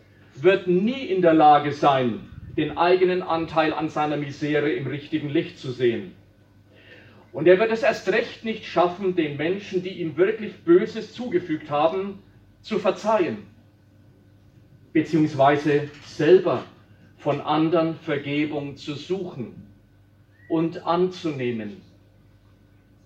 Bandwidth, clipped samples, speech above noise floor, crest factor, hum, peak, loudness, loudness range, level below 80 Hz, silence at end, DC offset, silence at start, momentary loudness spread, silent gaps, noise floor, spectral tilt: 7.8 kHz; under 0.1%; 33 dB; 20 dB; none; -4 dBFS; -23 LUFS; 8 LU; -60 dBFS; 1.25 s; under 0.1%; 0.35 s; 13 LU; none; -55 dBFS; -7 dB/octave